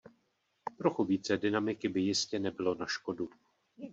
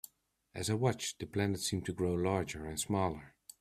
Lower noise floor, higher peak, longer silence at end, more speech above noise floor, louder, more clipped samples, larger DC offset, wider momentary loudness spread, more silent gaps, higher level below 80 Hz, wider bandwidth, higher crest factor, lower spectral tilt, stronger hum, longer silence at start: first, -77 dBFS vs -70 dBFS; about the same, -14 dBFS vs -16 dBFS; second, 0 s vs 0.3 s; first, 45 dB vs 35 dB; about the same, -33 LUFS vs -35 LUFS; neither; neither; about the same, 12 LU vs 14 LU; neither; second, -74 dBFS vs -60 dBFS; second, 8 kHz vs 15.5 kHz; about the same, 20 dB vs 20 dB; about the same, -4.5 dB/octave vs -5 dB/octave; neither; about the same, 0.65 s vs 0.55 s